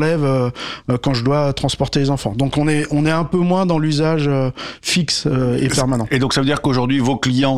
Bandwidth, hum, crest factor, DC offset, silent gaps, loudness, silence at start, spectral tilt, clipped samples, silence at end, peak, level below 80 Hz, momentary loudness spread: 14 kHz; none; 12 dB; 0.4%; none; -17 LUFS; 0 s; -5.5 dB/octave; under 0.1%; 0 s; -4 dBFS; -40 dBFS; 3 LU